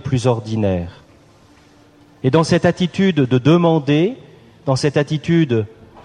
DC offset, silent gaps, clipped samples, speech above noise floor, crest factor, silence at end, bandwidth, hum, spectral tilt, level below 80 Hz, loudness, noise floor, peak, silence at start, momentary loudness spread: under 0.1%; none; under 0.1%; 33 dB; 16 dB; 0.35 s; 10.5 kHz; none; -7 dB/octave; -48 dBFS; -17 LUFS; -48 dBFS; -2 dBFS; 0.05 s; 10 LU